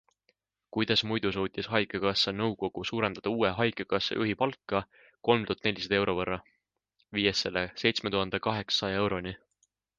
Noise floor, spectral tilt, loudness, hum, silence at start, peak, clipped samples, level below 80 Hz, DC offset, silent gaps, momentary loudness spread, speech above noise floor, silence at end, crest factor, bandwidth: -76 dBFS; -5 dB/octave; -29 LUFS; none; 0.75 s; -8 dBFS; under 0.1%; -58 dBFS; under 0.1%; none; 7 LU; 46 dB; 0.6 s; 24 dB; 9.6 kHz